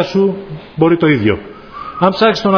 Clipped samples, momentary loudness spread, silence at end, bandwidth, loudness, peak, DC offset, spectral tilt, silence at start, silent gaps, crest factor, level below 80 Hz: under 0.1%; 16 LU; 0 s; 5.4 kHz; -14 LUFS; 0 dBFS; under 0.1%; -7 dB/octave; 0 s; none; 14 dB; -46 dBFS